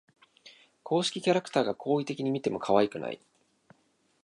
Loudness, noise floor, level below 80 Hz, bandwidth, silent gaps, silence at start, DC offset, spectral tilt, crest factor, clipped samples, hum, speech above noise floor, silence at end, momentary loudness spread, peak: -29 LUFS; -70 dBFS; -72 dBFS; 11.5 kHz; none; 0.45 s; under 0.1%; -5 dB/octave; 22 dB; under 0.1%; none; 42 dB; 1.1 s; 12 LU; -10 dBFS